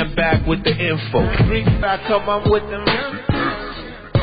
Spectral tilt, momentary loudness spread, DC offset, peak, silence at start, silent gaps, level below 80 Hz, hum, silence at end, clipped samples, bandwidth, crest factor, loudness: -11.5 dB/octave; 6 LU; under 0.1%; -4 dBFS; 0 s; none; -28 dBFS; none; 0 s; under 0.1%; 5 kHz; 14 dB; -18 LUFS